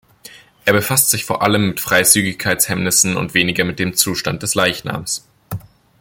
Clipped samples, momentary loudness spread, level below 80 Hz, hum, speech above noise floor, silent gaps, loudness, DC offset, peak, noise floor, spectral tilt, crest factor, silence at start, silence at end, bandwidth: under 0.1%; 11 LU; -50 dBFS; none; 26 dB; none; -15 LUFS; under 0.1%; 0 dBFS; -42 dBFS; -2.5 dB/octave; 18 dB; 0.25 s; 0.4 s; 17 kHz